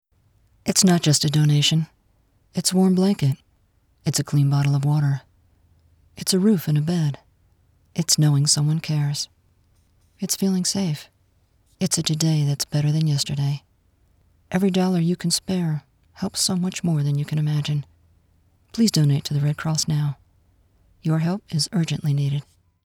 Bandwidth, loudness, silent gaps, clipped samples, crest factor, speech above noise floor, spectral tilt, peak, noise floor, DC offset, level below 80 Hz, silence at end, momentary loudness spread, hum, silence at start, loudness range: 18 kHz; -21 LUFS; none; under 0.1%; 20 dB; 41 dB; -5 dB/octave; -4 dBFS; -62 dBFS; under 0.1%; -58 dBFS; 0.45 s; 12 LU; none; 0.65 s; 3 LU